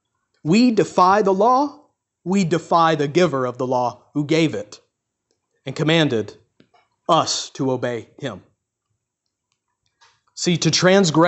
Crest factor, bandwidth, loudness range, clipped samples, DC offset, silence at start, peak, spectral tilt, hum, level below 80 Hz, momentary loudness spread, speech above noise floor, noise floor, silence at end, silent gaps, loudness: 18 dB; 8.4 kHz; 7 LU; under 0.1%; under 0.1%; 0.45 s; -2 dBFS; -5 dB/octave; none; -62 dBFS; 17 LU; 61 dB; -79 dBFS; 0 s; none; -19 LUFS